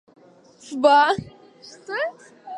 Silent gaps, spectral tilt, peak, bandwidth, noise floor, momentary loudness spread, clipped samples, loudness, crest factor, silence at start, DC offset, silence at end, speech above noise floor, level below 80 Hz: none; -4.5 dB/octave; -4 dBFS; 10.5 kHz; -51 dBFS; 18 LU; under 0.1%; -20 LUFS; 20 dB; 0.65 s; under 0.1%; 0 s; 30 dB; -62 dBFS